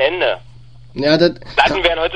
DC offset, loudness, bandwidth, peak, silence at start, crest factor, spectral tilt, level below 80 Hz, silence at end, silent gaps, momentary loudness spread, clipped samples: 0.9%; -15 LUFS; 9.6 kHz; 0 dBFS; 0 s; 16 dB; -5.5 dB/octave; -38 dBFS; 0 s; none; 10 LU; under 0.1%